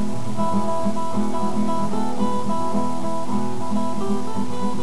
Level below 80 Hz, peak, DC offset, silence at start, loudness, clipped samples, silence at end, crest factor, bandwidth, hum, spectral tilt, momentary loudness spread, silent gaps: -56 dBFS; -8 dBFS; 10%; 0 s; -25 LUFS; under 0.1%; 0 s; 14 dB; 11 kHz; none; -6.5 dB/octave; 3 LU; none